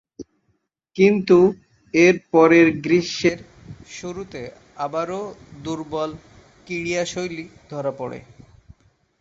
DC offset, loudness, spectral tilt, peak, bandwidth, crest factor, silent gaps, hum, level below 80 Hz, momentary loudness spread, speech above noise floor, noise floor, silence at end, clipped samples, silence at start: under 0.1%; -19 LUFS; -5.5 dB/octave; -2 dBFS; 7.8 kHz; 18 dB; none; none; -56 dBFS; 21 LU; 50 dB; -70 dBFS; 1 s; under 0.1%; 0.2 s